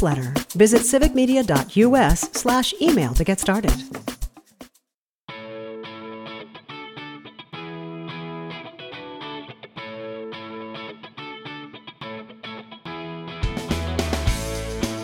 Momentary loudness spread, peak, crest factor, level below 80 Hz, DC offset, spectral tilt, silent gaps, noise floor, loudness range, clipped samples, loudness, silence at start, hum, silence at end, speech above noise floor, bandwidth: 19 LU; -2 dBFS; 22 dB; -34 dBFS; under 0.1%; -4.5 dB/octave; 4.94-5.28 s; -79 dBFS; 18 LU; under 0.1%; -21 LUFS; 0 s; none; 0 s; 61 dB; 19.5 kHz